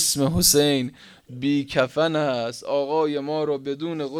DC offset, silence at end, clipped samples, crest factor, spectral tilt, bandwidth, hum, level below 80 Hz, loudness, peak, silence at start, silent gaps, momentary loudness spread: under 0.1%; 0 s; under 0.1%; 20 dB; -3.5 dB/octave; 19 kHz; none; -48 dBFS; -22 LUFS; -4 dBFS; 0 s; none; 12 LU